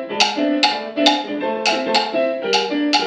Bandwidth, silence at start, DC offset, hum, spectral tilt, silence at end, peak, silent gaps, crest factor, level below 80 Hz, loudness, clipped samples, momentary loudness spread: 10.5 kHz; 0 s; under 0.1%; none; -2 dB/octave; 0 s; 0 dBFS; none; 18 dB; -78 dBFS; -18 LUFS; under 0.1%; 4 LU